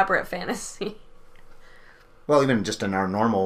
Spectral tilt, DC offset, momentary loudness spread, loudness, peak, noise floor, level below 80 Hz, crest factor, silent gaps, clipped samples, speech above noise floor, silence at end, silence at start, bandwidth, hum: -5 dB/octave; under 0.1%; 14 LU; -25 LUFS; -6 dBFS; -49 dBFS; -50 dBFS; 18 dB; none; under 0.1%; 26 dB; 0 s; 0 s; 15.5 kHz; none